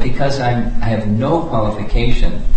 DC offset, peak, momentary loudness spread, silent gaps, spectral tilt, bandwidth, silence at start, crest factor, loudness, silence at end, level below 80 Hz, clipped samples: under 0.1%; -2 dBFS; 3 LU; none; -7 dB/octave; 8.4 kHz; 0 s; 12 dB; -18 LUFS; 0 s; -18 dBFS; under 0.1%